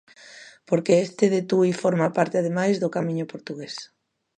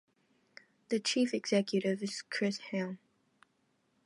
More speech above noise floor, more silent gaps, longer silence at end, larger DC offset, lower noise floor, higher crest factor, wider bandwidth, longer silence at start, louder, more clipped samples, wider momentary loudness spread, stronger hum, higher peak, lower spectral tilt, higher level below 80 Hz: second, 24 dB vs 42 dB; neither; second, 0.55 s vs 1.1 s; neither; second, -47 dBFS vs -76 dBFS; about the same, 20 dB vs 18 dB; second, 9.8 kHz vs 11.5 kHz; second, 0.25 s vs 0.9 s; first, -23 LUFS vs -34 LUFS; neither; first, 15 LU vs 8 LU; neither; first, -4 dBFS vs -16 dBFS; first, -6.5 dB/octave vs -4.5 dB/octave; first, -72 dBFS vs -86 dBFS